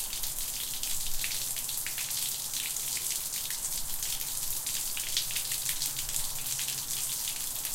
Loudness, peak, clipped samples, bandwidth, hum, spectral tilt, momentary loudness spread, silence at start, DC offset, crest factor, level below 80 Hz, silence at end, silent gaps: -31 LUFS; -12 dBFS; under 0.1%; 17 kHz; none; 1 dB/octave; 2 LU; 0 s; under 0.1%; 22 dB; -48 dBFS; 0 s; none